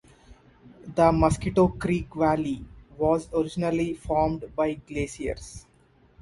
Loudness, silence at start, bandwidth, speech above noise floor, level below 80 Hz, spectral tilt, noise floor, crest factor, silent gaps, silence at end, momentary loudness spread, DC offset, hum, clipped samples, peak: -26 LUFS; 0.3 s; 11.5 kHz; 35 dB; -42 dBFS; -7 dB/octave; -60 dBFS; 20 dB; none; 0.6 s; 12 LU; under 0.1%; none; under 0.1%; -6 dBFS